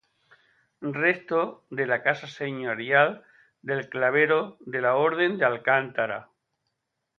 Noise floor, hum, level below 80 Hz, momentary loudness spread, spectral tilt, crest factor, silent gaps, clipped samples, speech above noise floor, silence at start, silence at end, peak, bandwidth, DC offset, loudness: -80 dBFS; none; -76 dBFS; 11 LU; -6.5 dB/octave; 22 dB; none; under 0.1%; 55 dB; 0.8 s; 0.95 s; -4 dBFS; 7 kHz; under 0.1%; -25 LUFS